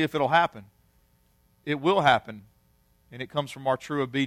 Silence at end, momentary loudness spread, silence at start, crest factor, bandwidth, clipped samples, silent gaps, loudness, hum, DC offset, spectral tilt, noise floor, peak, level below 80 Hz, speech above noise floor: 0 s; 19 LU; 0 s; 20 dB; 15.5 kHz; under 0.1%; none; -25 LUFS; none; under 0.1%; -5.5 dB/octave; -65 dBFS; -6 dBFS; -64 dBFS; 39 dB